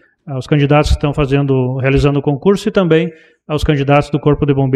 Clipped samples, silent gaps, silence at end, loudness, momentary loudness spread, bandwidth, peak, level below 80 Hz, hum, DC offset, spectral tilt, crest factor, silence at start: under 0.1%; none; 0 s; -14 LUFS; 6 LU; 10.5 kHz; 0 dBFS; -26 dBFS; none; under 0.1%; -7.5 dB/octave; 12 dB; 0.25 s